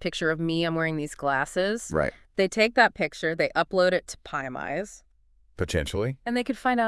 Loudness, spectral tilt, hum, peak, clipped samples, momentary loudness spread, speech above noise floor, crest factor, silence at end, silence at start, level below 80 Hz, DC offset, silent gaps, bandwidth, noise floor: -26 LUFS; -5 dB/octave; none; -6 dBFS; under 0.1%; 10 LU; 35 dB; 20 dB; 0 s; 0 s; -50 dBFS; under 0.1%; none; 12 kHz; -61 dBFS